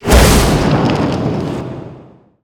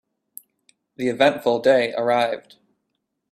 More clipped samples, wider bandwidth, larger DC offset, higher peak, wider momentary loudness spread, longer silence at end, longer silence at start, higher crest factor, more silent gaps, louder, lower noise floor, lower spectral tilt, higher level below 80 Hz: neither; first, over 20 kHz vs 14.5 kHz; neither; first, 0 dBFS vs -4 dBFS; first, 19 LU vs 9 LU; second, 0.4 s vs 0.9 s; second, 0 s vs 1 s; second, 12 dB vs 20 dB; neither; first, -13 LUFS vs -20 LUFS; second, -40 dBFS vs -77 dBFS; about the same, -5 dB/octave vs -5 dB/octave; first, -18 dBFS vs -70 dBFS